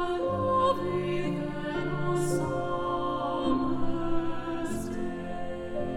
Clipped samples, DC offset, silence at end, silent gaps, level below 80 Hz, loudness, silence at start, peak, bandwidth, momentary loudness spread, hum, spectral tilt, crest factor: under 0.1%; under 0.1%; 0 s; none; -44 dBFS; -30 LUFS; 0 s; -14 dBFS; 13 kHz; 8 LU; none; -6.5 dB/octave; 14 dB